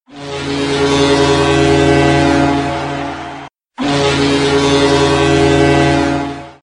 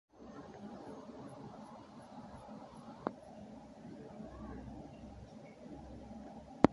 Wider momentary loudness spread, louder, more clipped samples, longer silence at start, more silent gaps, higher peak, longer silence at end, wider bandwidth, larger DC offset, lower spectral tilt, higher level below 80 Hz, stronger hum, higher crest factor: first, 12 LU vs 9 LU; first, -12 LUFS vs -48 LUFS; neither; about the same, 0.1 s vs 0.15 s; neither; first, 0 dBFS vs -4 dBFS; about the same, 0.1 s vs 0 s; about the same, 11 kHz vs 11.5 kHz; neither; second, -5 dB/octave vs -7.5 dB/octave; first, -32 dBFS vs -60 dBFS; neither; second, 12 dB vs 38 dB